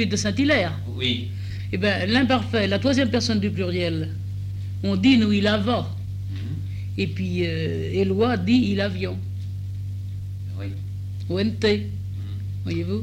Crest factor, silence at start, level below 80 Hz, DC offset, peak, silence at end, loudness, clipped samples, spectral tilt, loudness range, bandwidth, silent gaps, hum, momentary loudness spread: 16 dB; 0 s; -48 dBFS; under 0.1%; -8 dBFS; 0 s; -24 LUFS; under 0.1%; -6 dB/octave; 5 LU; 9.6 kHz; none; none; 12 LU